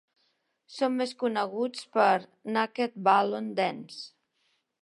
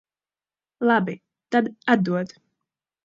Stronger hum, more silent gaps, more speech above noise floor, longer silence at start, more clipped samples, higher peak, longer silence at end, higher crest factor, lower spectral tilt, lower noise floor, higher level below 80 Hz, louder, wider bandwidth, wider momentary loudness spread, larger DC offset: neither; neither; second, 46 dB vs over 68 dB; about the same, 0.7 s vs 0.8 s; neither; second, -10 dBFS vs -4 dBFS; about the same, 0.75 s vs 0.8 s; about the same, 20 dB vs 22 dB; second, -5 dB/octave vs -7.5 dB/octave; second, -74 dBFS vs under -90 dBFS; second, -84 dBFS vs -72 dBFS; second, -28 LUFS vs -23 LUFS; first, 11.5 kHz vs 7.6 kHz; first, 17 LU vs 12 LU; neither